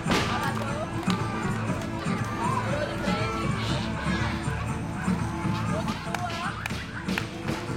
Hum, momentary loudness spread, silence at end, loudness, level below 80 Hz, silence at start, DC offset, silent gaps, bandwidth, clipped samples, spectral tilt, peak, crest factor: none; 4 LU; 0 s; -29 LUFS; -44 dBFS; 0 s; under 0.1%; none; 16.5 kHz; under 0.1%; -5.5 dB/octave; -10 dBFS; 20 dB